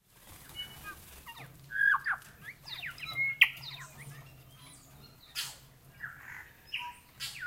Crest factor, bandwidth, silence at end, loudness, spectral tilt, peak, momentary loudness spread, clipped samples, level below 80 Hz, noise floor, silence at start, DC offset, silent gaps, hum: 30 dB; 16 kHz; 0 s; -32 LUFS; -0.5 dB/octave; -8 dBFS; 27 LU; under 0.1%; -64 dBFS; -56 dBFS; 0.2 s; under 0.1%; none; none